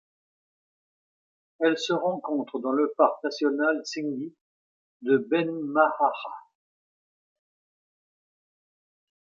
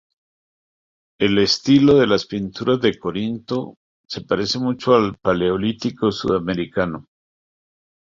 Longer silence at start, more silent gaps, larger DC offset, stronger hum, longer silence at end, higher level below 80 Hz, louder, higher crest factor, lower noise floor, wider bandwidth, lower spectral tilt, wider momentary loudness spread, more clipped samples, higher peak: first, 1.6 s vs 1.2 s; first, 4.41-5.00 s vs 3.76-4.04 s; neither; neither; first, 2.85 s vs 1 s; second, -86 dBFS vs -50 dBFS; second, -26 LUFS vs -19 LUFS; about the same, 22 dB vs 18 dB; about the same, under -90 dBFS vs under -90 dBFS; about the same, 7.6 kHz vs 7.6 kHz; about the same, -5 dB/octave vs -6 dB/octave; about the same, 13 LU vs 12 LU; neither; second, -6 dBFS vs -2 dBFS